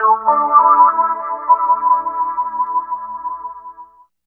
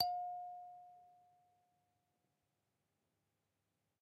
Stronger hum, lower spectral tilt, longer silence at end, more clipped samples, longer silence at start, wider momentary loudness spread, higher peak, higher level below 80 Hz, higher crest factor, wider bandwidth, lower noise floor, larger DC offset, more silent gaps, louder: first, 60 Hz at -60 dBFS vs none; first, -8 dB/octave vs -0.5 dB/octave; second, 0.45 s vs 2.85 s; neither; about the same, 0 s vs 0 s; second, 16 LU vs 22 LU; first, 0 dBFS vs -20 dBFS; first, -62 dBFS vs -88 dBFS; second, 16 dB vs 30 dB; second, 2.5 kHz vs 8 kHz; second, -42 dBFS vs -87 dBFS; neither; neither; first, -15 LUFS vs -45 LUFS